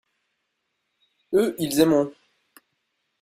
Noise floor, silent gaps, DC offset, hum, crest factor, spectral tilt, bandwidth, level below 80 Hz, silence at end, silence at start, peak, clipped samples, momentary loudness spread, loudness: -77 dBFS; none; under 0.1%; none; 22 dB; -5 dB/octave; 16 kHz; -64 dBFS; 1.1 s; 1.3 s; -4 dBFS; under 0.1%; 6 LU; -22 LUFS